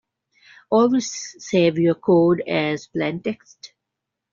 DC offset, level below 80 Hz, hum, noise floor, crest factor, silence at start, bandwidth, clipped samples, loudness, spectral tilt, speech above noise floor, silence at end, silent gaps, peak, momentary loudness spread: under 0.1%; -62 dBFS; none; -82 dBFS; 16 dB; 0.7 s; 7.6 kHz; under 0.1%; -20 LUFS; -5.5 dB/octave; 63 dB; 0.65 s; none; -6 dBFS; 12 LU